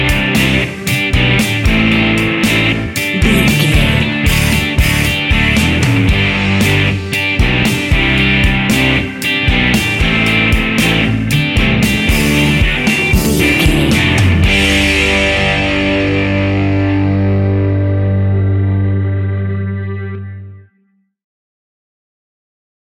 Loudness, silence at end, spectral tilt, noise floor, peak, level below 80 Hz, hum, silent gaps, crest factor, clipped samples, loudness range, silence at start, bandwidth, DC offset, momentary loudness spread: -12 LUFS; 2.35 s; -5 dB/octave; -58 dBFS; 0 dBFS; -22 dBFS; 50 Hz at -40 dBFS; none; 12 dB; under 0.1%; 6 LU; 0 s; 17 kHz; under 0.1%; 5 LU